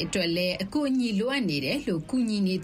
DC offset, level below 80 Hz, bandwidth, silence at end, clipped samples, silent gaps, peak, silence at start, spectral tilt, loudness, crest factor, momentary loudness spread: under 0.1%; -56 dBFS; 15.5 kHz; 0 s; under 0.1%; none; -14 dBFS; 0 s; -5 dB/octave; -27 LUFS; 12 dB; 2 LU